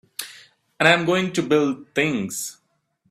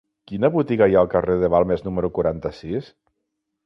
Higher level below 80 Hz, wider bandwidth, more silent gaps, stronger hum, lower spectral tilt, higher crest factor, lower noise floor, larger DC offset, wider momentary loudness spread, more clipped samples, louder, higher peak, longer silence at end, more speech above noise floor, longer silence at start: second, -64 dBFS vs -44 dBFS; first, 16 kHz vs 6 kHz; neither; neither; second, -4 dB/octave vs -9.5 dB/octave; about the same, 22 dB vs 18 dB; second, -68 dBFS vs -78 dBFS; neither; first, 17 LU vs 13 LU; neither; about the same, -20 LUFS vs -20 LUFS; first, 0 dBFS vs -4 dBFS; second, 0.6 s vs 0.8 s; second, 47 dB vs 58 dB; about the same, 0.2 s vs 0.3 s